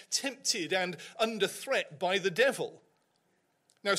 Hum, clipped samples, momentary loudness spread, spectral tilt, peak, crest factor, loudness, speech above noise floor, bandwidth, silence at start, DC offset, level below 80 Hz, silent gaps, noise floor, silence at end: none; under 0.1%; 9 LU; -2 dB/octave; -14 dBFS; 18 dB; -31 LUFS; 43 dB; 16 kHz; 0 s; under 0.1%; -80 dBFS; none; -74 dBFS; 0 s